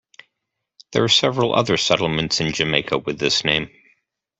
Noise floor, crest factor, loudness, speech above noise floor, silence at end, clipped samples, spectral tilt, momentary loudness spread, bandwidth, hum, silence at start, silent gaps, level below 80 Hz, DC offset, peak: -79 dBFS; 20 dB; -19 LUFS; 60 dB; 0.7 s; under 0.1%; -3.5 dB/octave; 7 LU; 8.4 kHz; none; 0.9 s; none; -52 dBFS; under 0.1%; -2 dBFS